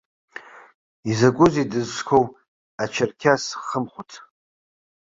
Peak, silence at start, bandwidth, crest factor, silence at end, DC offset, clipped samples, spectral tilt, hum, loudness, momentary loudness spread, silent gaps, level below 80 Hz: -2 dBFS; 0.35 s; 7.8 kHz; 22 dB; 0.85 s; under 0.1%; under 0.1%; -5.5 dB/octave; none; -21 LUFS; 23 LU; 0.75-1.03 s, 2.48-2.78 s; -56 dBFS